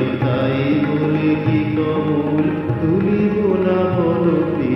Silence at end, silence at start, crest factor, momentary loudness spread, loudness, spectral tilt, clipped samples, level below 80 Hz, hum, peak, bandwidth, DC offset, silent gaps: 0 s; 0 s; 12 dB; 2 LU; -18 LUFS; -10 dB/octave; under 0.1%; -46 dBFS; none; -4 dBFS; 5.8 kHz; under 0.1%; none